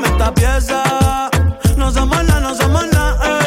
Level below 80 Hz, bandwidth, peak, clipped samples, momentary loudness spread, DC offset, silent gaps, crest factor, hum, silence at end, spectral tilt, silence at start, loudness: -18 dBFS; 16.5 kHz; 0 dBFS; under 0.1%; 2 LU; under 0.1%; none; 12 dB; none; 0 s; -5 dB/octave; 0 s; -15 LUFS